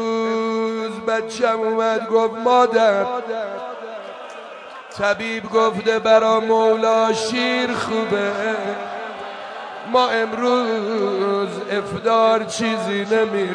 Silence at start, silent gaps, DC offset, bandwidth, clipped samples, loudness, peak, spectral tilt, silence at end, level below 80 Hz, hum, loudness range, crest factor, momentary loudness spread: 0 s; none; under 0.1%; 10.5 kHz; under 0.1%; -19 LUFS; -2 dBFS; -4 dB/octave; 0 s; -62 dBFS; none; 4 LU; 18 dB; 16 LU